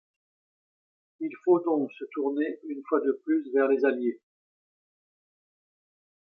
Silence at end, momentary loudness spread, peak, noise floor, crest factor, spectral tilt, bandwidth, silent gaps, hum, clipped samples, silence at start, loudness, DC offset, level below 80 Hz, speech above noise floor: 2.15 s; 12 LU; -10 dBFS; under -90 dBFS; 20 dB; -9 dB/octave; 5.6 kHz; none; none; under 0.1%; 1.2 s; -27 LUFS; under 0.1%; -88 dBFS; over 63 dB